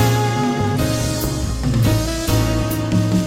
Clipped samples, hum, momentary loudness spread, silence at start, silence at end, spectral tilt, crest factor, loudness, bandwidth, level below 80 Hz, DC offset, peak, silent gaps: under 0.1%; none; 4 LU; 0 s; 0 s; -5.5 dB/octave; 14 dB; -19 LUFS; 16.5 kHz; -28 dBFS; under 0.1%; -2 dBFS; none